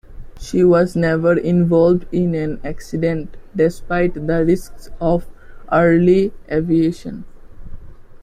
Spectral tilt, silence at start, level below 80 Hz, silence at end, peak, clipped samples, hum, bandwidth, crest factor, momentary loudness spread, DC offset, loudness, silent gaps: -8 dB/octave; 0.1 s; -36 dBFS; 0 s; -2 dBFS; under 0.1%; none; 13.5 kHz; 14 dB; 13 LU; under 0.1%; -17 LUFS; none